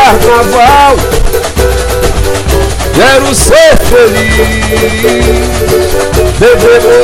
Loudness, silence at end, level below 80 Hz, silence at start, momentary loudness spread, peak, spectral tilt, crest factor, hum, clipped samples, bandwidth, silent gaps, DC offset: -6 LUFS; 0 s; -14 dBFS; 0 s; 7 LU; 0 dBFS; -4 dB/octave; 6 dB; none; 2%; 17 kHz; none; under 0.1%